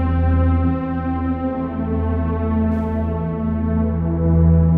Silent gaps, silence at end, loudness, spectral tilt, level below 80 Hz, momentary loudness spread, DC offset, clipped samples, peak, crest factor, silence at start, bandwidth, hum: none; 0 s; -20 LUFS; -12 dB/octave; -24 dBFS; 6 LU; under 0.1%; under 0.1%; -6 dBFS; 12 dB; 0 s; 3.5 kHz; none